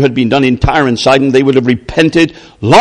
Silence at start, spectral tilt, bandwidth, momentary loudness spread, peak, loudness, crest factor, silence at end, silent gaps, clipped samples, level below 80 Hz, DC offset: 0 s; -6 dB/octave; 10.5 kHz; 4 LU; 0 dBFS; -10 LUFS; 10 dB; 0 s; none; 1%; -28 dBFS; under 0.1%